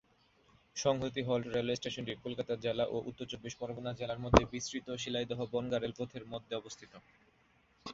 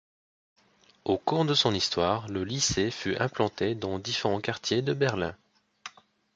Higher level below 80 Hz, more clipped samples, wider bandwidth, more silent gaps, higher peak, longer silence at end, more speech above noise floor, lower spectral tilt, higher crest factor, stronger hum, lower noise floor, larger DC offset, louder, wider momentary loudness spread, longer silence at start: about the same, -52 dBFS vs -54 dBFS; neither; second, 7.6 kHz vs 9.4 kHz; neither; about the same, -6 dBFS vs -8 dBFS; second, 0 s vs 0.45 s; first, 34 dB vs 21 dB; about the same, -4.5 dB/octave vs -4 dB/octave; first, 30 dB vs 22 dB; neither; first, -70 dBFS vs -49 dBFS; neither; second, -36 LUFS vs -28 LUFS; about the same, 14 LU vs 12 LU; second, 0.75 s vs 1.05 s